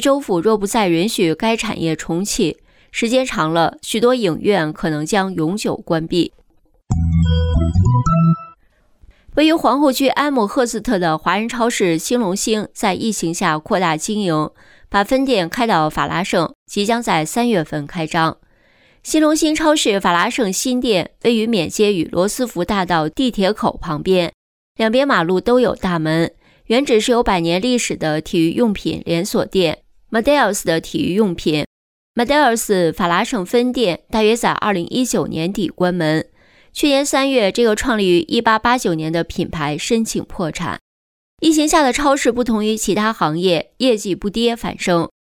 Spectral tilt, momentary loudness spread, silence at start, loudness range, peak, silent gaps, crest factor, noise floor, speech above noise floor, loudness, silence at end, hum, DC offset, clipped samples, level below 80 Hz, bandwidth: -4.5 dB/octave; 7 LU; 0 s; 2 LU; -2 dBFS; 16.55-16.66 s, 24.34-24.75 s, 31.66-32.14 s, 40.81-41.37 s; 14 dB; -55 dBFS; 39 dB; -17 LUFS; 0.25 s; none; under 0.1%; under 0.1%; -36 dBFS; 19 kHz